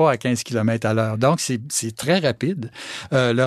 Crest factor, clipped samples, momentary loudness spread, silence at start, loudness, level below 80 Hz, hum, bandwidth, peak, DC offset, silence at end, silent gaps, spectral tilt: 16 dB; under 0.1%; 6 LU; 0 s; -21 LUFS; -60 dBFS; none; 15.5 kHz; -4 dBFS; under 0.1%; 0 s; none; -5 dB/octave